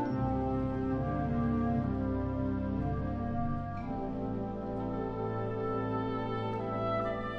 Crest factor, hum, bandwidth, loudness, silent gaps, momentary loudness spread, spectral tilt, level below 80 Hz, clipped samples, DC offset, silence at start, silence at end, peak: 12 dB; none; 6.2 kHz; -34 LUFS; none; 5 LU; -10 dB/octave; -44 dBFS; under 0.1%; under 0.1%; 0 s; 0 s; -20 dBFS